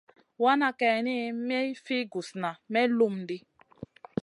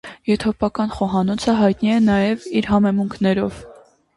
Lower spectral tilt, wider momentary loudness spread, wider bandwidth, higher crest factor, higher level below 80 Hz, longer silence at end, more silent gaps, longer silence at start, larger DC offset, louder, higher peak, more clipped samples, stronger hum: second, -5.5 dB/octave vs -7 dB/octave; first, 15 LU vs 6 LU; about the same, 11 kHz vs 11.5 kHz; about the same, 18 dB vs 14 dB; second, -72 dBFS vs -44 dBFS; about the same, 0.4 s vs 0.45 s; neither; first, 0.4 s vs 0.05 s; neither; second, -28 LUFS vs -19 LUFS; second, -10 dBFS vs -4 dBFS; neither; neither